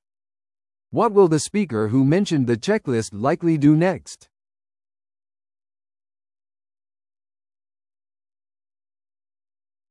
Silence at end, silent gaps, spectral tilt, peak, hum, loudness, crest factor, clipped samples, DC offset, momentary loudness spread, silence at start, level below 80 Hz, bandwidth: 5.75 s; none; -6.5 dB/octave; -4 dBFS; none; -20 LUFS; 18 dB; under 0.1%; under 0.1%; 7 LU; 0.9 s; -62 dBFS; 12 kHz